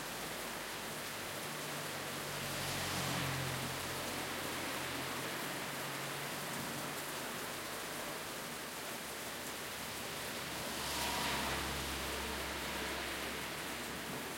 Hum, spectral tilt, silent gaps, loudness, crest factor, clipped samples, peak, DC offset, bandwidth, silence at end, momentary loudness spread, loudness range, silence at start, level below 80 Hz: none; -2.5 dB/octave; none; -40 LUFS; 16 dB; under 0.1%; -26 dBFS; under 0.1%; 16.5 kHz; 0 s; 5 LU; 3 LU; 0 s; -60 dBFS